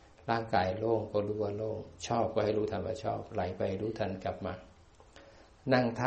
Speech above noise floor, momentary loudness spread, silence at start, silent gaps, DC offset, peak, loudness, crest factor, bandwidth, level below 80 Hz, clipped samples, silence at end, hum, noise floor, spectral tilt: 25 dB; 9 LU; 0.2 s; none; under 0.1%; -12 dBFS; -34 LUFS; 22 dB; 8.4 kHz; -60 dBFS; under 0.1%; 0 s; none; -57 dBFS; -6.5 dB/octave